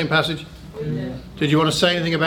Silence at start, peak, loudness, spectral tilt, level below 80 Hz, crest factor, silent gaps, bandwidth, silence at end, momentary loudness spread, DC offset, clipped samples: 0 s; -2 dBFS; -20 LUFS; -5 dB/octave; -46 dBFS; 20 dB; none; 17 kHz; 0 s; 14 LU; under 0.1%; under 0.1%